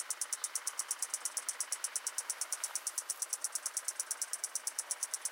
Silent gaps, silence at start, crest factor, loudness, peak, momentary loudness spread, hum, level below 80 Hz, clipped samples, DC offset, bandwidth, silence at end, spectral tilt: none; 0 s; 22 dB; -37 LUFS; -18 dBFS; 1 LU; none; under -90 dBFS; under 0.1%; under 0.1%; 17 kHz; 0 s; 5.5 dB/octave